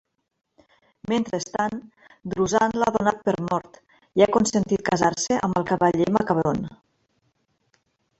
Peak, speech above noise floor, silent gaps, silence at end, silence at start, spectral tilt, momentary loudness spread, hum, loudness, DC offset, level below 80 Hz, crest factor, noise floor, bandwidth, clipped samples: -4 dBFS; 47 dB; none; 1.45 s; 1.1 s; -5 dB/octave; 9 LU; none; -23 LUFS; under 0.1%; -54 dBFS; 20 dB; -70 dBFS; 8.2 kHz; under 0.1%